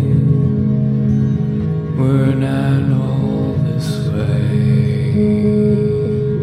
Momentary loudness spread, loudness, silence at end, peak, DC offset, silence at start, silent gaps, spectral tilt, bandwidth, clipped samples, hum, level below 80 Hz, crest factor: 4 LU; -16 LUFS; 0 s; -2 dBFS; under 0.1%; 0 s; none; -9 dB/octave; 10.5 kHz; under 0.1%; none; -38 dBFS; 12 dB